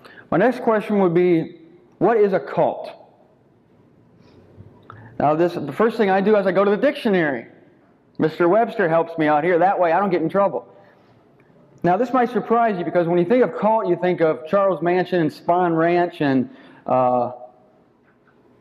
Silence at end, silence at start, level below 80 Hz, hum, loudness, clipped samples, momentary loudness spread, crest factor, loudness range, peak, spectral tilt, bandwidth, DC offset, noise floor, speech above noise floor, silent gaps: 1.15 s; 0.15 s; -64 dBFS; none; -19 LUFS; under 0.1%; 7 LU; 14 dB; 5 LU; -6 dBFS; -8.5 dB/octave; 11.5 kHz; under 0.1%; -57 dBFS; 38 dB; none